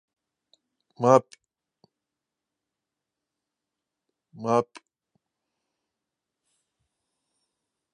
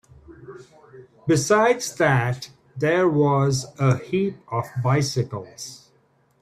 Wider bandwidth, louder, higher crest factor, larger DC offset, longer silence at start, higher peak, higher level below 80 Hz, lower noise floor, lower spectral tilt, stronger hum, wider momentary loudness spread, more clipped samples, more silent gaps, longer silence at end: second, 9.8 kHz vs 14.5 kHz; about the same, -23 LUFS vs -22 LUFS; first, 30 dB vs 18 dB; neither; first, 1 s vs 0.3 s; first, -2 dBFS vs -6 dBFS; second, -78 dBFS vs -58 dBFS; first, -87 dBFS vs -62 dBFS; about the same, -6.5 dB/octave vs -5.5 dB/octave; neither; second, 15 LU vs 18 LU; neither; neither; first, 3.3 s vs 0.65 s